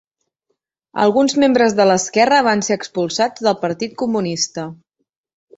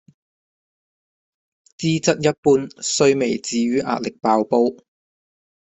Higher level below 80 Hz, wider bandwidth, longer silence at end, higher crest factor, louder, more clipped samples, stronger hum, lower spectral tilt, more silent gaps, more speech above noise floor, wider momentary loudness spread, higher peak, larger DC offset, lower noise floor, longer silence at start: about the same, -60 dBFS vs -60 dBFS; about the same, 8.2 kHz vs 8.4 kHz; about the same, 0.85 s vs 0.95 s; about the same, 16 dB vs 18 dB; first, -16 LUFS vs -19 LUFS; neither; neither; about the same, -4 dB/octave vs -4.5 dB/octave; second, none vs 2.38-2.43 s; second, 58 dB vs over 71 dB; first, 9 LU vs 6 LU; about the same, -2 dBFS vs -2 dBFS; neither; second, -74 dBFS vs under -90 dBFS; second, 0.95 s vs 1.8 s